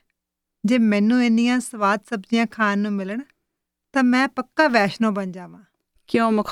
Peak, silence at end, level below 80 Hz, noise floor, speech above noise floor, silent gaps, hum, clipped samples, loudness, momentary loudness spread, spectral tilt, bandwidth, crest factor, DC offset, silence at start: -2 dBFS; 0 s; -66 dBFS; -82 dBFS; 62 dB; none; none; under 0.1%; -20 LUFS; 11 LU; -5.5 dB/octave; 12 kHz; 20 dB; under 0.1%; 0.65 s